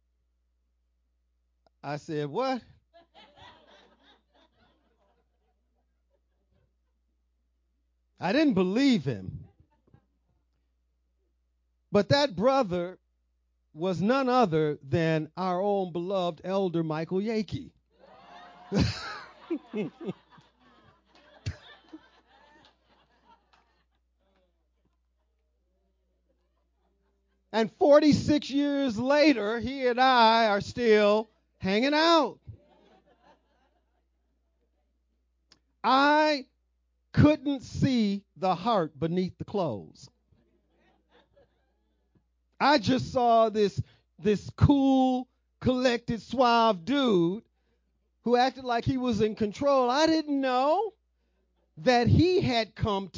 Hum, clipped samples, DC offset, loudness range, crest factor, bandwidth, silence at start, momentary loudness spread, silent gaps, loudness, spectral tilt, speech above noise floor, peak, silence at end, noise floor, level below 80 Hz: none; under 0.1%; under 0.1%; 13 LU; 20 dB; 7.6 kHz; 1.85 s; 15 LU; none; -26 LUFS; -6.5 dB/octave; 48 dB; -8 dBFS; 0 s; -74 dBFS; -52 dBFS